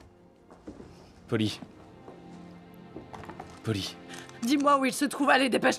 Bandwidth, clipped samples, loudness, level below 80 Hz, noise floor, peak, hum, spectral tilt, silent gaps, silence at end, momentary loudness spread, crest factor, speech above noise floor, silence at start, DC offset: 15 kHz; under 0.1%; -27 LUFS; -64 dBFS; -56 dBFS; -8 dBFS; none; -4.5 dB/octave; none; 0 s; 26 LU; 22 dB; 30 dB; 0.5 s; under 0.1%